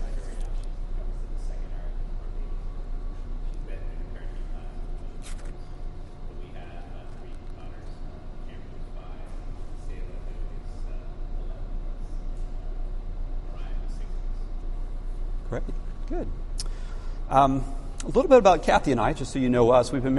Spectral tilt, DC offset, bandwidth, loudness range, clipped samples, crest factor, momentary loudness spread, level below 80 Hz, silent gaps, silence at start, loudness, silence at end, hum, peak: -6.5 dB/octave; under 0.1%; 11.5 kHz; 20 LU; under 0.1%; 22 dB; 21 LU; -32 dBFS; none; 0 s; -28 LUFS; 0 s; none; -4 dBFS